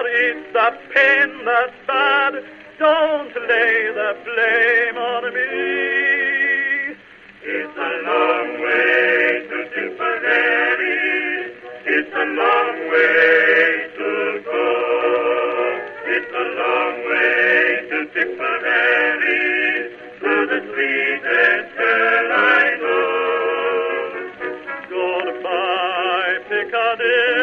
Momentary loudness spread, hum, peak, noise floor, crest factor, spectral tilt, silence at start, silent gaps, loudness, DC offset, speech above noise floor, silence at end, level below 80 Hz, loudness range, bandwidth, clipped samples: 10 LU; none; -2 dBFS; -43 dBFS; 16 dB; -4 dB/octave; 0 s; none; -17 LUFS; under 0.1%; 26 dB; 0 s; -66 dBFS; 3 LU; 6.6 kHz; under 0.1%